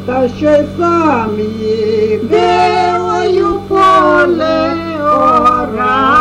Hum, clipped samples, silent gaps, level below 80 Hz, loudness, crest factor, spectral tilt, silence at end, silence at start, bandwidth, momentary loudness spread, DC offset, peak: none; under 0.1%; none; -38 dBFS; -11 LUFS; 10 dB; -6 dB/octave; 0 s; 0 s; 11 kHz; 7 LU; under 0.1%; 0 dBFS